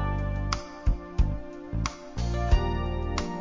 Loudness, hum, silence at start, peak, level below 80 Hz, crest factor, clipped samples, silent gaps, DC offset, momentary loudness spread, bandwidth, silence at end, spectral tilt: -30 LUFS; none; 0 s; -8 dBFS; -30 dBFS; 18 dB; under 0.1%; none; 0.2%; 7 LU; 7.6 kHz; 0 s; -6 dB/octave